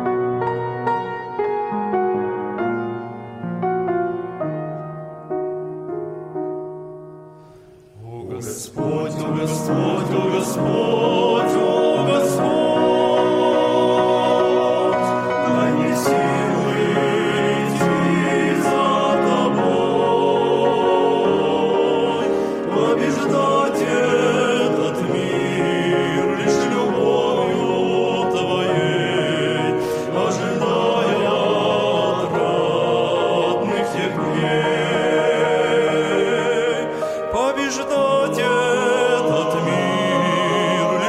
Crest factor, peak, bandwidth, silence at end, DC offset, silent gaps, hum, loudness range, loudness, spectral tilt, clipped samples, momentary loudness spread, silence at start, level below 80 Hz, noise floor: 14 dB; -4 dBFS; 16 kHz; 0 s; under 0.1%; none; none; 8 LU; -19 LUFS; -5.5 dB/octave; under 0.1%; 9 LU; 0 s; -56 dBFS; -45 dBFS